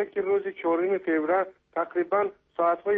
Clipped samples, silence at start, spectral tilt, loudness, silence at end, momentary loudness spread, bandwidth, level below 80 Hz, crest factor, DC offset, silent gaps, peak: under 0.1%; 0 s; -9 dB/octave; -27 LUFS; 0 s; 6 LU; 3.8 kHz; -70 dBFS; 14 dB; under 0.1%; none; -12 dBFS